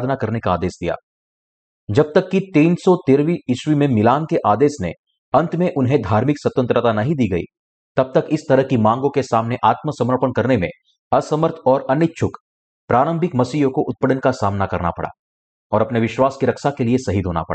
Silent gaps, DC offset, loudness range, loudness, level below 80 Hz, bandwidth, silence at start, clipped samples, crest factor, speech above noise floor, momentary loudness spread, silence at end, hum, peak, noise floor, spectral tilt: 1.03-1.87 s, 4.99-5.04 s, 5.18-5.32 s, 7.59-7.95 s, 10.99-11.11 s, 12.40-12.88 s, 15.19-15.70 s; under 0.1%; 3 LU; -18 LUFS; -48 dBFS; 8.8 kHz; 0 s; under 0.1%; 14 dB; over 73 dB; 7 LU; 0 s; none; -4 dBFS; under -90 dBFS; -7.5 dB/octave